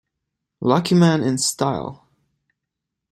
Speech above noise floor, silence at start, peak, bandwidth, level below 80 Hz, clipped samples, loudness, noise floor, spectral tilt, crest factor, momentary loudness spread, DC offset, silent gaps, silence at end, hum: 64 dB; 0.6 s; -2 dBFS; 13.5 kHz; -58 dBFS; under 0.1%; -19 LUFS; -82 dBFS; -5 dB/octave; 20 dB; 11 LU; under 0.1%; none; 1.15 s; none